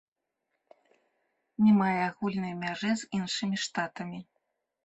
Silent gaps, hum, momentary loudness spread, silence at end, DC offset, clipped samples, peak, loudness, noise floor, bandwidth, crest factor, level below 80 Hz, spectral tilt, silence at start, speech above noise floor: none; none; 17 LU; 0.65 s; under 0.1%; under 0.1%; -14 dBFS; -29 LUFS; -83 dBFS; 8.2 kHz; 16 dB; -72 dBFS; -5 dB/octave; 1.6 s; 54 dB